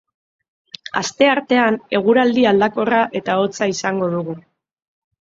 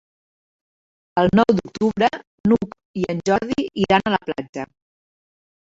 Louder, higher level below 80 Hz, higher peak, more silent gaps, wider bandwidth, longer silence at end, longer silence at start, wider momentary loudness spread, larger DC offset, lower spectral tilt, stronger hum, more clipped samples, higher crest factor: first, -17 LUFS vs -20 LUFS; second, -60 dBFS vs -50 dBFS; about the same, 0 dBFS vs -2 dBFS; second, none vs 2.27-2.44 s, 2.85-2.94 s, 4.49-4.53 s; about the same, 7.8 kHz vs 7.8 kHz; second, 0.8 s vs 0.95 s; second, 0.95 s vs 1.15 s; about the same, 11 LU vs 12 LU; neither; second, -4.5 dB/octave vs -6.5 dB/octave; neither; neither; about the same, 18 dB vs 20 dB